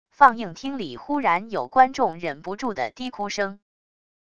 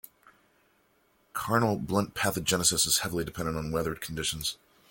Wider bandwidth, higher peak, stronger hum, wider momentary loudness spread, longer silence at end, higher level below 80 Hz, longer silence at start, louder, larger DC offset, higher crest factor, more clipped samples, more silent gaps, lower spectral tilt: second, 7.8 kHz vs 17 kHz; first, 0 dBFS vs -8 dBFS; neither; first, 14 LU vs 10 LU; first, 0.75 s vs 0.35 s; second, -60 dBFS vs -52 dBFS; second, 0.2 s vs 1.35 s; first, -23 LUFS vs -28 LUFS; first, 0.4% vs under 0.1%; about the same, 24 dB vs 22 dB; neither; neither; first, -4.5 dB/octave vs -3 dB/octave